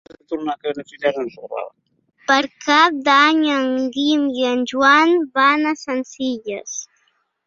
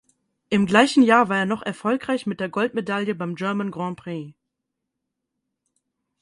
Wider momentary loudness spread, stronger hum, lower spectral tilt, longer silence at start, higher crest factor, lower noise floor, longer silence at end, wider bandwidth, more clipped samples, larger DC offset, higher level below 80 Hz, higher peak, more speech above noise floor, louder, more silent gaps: first, 17 LU vs 14 LU; neither; second, -2 dB/octave vs -5.5 dB/octave; second, 0.3 s vs 0.5 s; about the same, 18 dB vs 22 dB; second, -65 dBFS vs -81 dBFS; second, 0.6 s vs 1.9 s; second, 7.6 kHz vs 11.5 kHz; neither; neither; about the same, -66 dBFS vs -64 dBFS; about the same, -2 dBFS vs -2 dBFS; second, 47 dB vs 60 dB; first, -17 LUFS vs -21 LUFS; neither